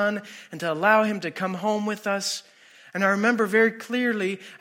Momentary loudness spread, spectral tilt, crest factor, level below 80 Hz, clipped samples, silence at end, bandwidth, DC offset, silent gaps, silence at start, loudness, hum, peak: 11 LU; -4.5 dB/octave; 18 dB; -78 dBFS; under 0.1%; 0.05 s; 16.5 kHz; under 0.1%; none; 0 s; -24 LUFS; none; -6 dBFS